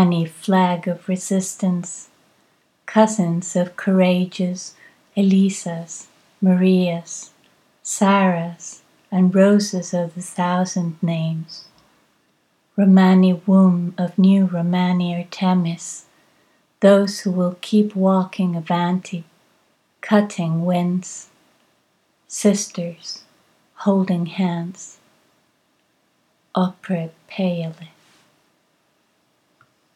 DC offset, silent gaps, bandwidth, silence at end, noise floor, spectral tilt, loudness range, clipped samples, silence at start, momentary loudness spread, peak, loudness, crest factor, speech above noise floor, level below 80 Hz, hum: under 0.1%; none; 12 kHz; 2.1 s; -64 dBFS; -6.5 dB/octave; 10 LU; under 0.1%; 0 s; 18 LU; 0 dBFS; -19 LUFS; 20 dB; 46 dB; -78 dBFS; none